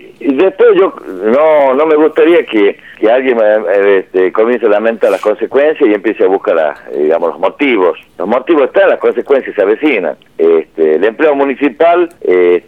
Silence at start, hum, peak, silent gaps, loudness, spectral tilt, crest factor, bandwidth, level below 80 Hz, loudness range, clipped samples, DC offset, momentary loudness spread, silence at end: 0.05 s; none; 0 dBFS; none; -10 LUFS; -6.5 dB/octave; 10 dB; 9.4 kHz; -58 dBFS; 2 LU; under 0.1%; 0.2%; 6 LU; 0.1 s